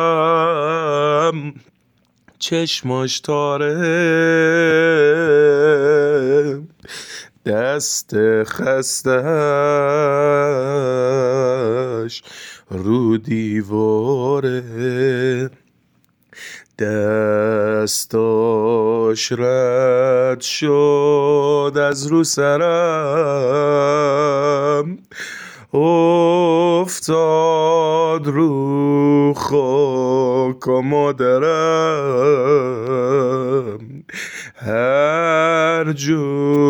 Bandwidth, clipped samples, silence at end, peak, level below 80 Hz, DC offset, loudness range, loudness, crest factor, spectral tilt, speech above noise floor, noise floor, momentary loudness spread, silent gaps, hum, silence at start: 19.5 kHz; under 0.1%; 0 s; -4 dBFS; -62 dBFS; under 0.1%; 5 LU; -16 LUFS; 12 dB; -5 dB/octave; 45 dB; -60 dBFS; 11 LU; none; none; 0 s